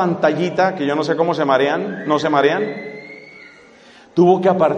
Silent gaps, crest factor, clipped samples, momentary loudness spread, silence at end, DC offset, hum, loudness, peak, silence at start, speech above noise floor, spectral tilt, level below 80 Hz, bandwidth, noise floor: none; 16 dB; under 0.1%; 17 LU; 0 s; under 0.1%; none; -17 LUFS; -2 dBFS; 0 s; 29 dB; -6.5 dB/octave; -64 dBFS; 8.4 kHz; -45 dBFS